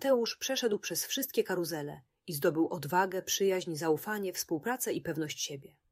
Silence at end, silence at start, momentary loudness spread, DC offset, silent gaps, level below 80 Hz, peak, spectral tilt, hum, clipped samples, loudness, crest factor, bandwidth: 0.25 s; 0 s; 8 LU; under 0.1%; none; -74 dBFS; -14 dBFS; -3.5 dB/octave; none; under 0.1%; -32 LUFS; 18 dB; 16 kHz